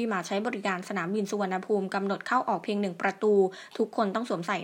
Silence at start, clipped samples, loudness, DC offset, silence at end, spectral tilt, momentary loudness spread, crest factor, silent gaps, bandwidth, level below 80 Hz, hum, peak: 0 s; under 0.1%; -29 LUFS; under 0.1%; 0 s; -5.5 dB/octave; 6 LU; 18 dB; none; 16 kHz; -82 dBFS; none; -10 dBFS